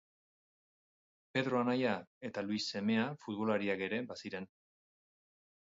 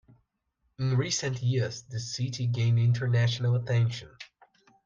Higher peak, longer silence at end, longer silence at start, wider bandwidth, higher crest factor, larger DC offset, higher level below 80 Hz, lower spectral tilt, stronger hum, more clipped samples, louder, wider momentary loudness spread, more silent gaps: second, -20 dBFS vs -16 dBFS; first, 1.3 s vs 0.6 s; first, 1.35 s vs 0.8 s; about the same, 7.6 kHz vs 7.6 kHz; first, 18 dB vs 12 dB; neither; second, -78 dBFS vs -64 dBFS; about the same, -4 dB/octave vs -5 dB/octave; neither; neither; second, -36 LUFS vs -28 LUFS; about the same, 11 LU vs 12 LU; first, 2.07-2.21 s vs none